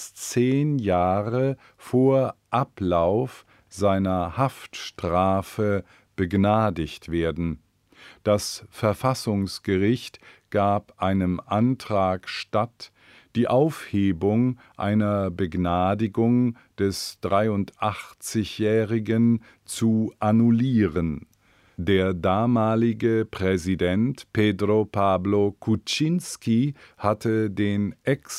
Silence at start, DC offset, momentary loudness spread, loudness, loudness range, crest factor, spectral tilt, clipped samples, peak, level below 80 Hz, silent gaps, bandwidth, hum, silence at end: 0 s; under 0.1%; 8 LU; -24 LUFS; 3 LU; 18 dB; -6.5 dB/octave; under 0.1%; -6 dBFS; -50 dBFS; none; 15 kHz; none; 0 s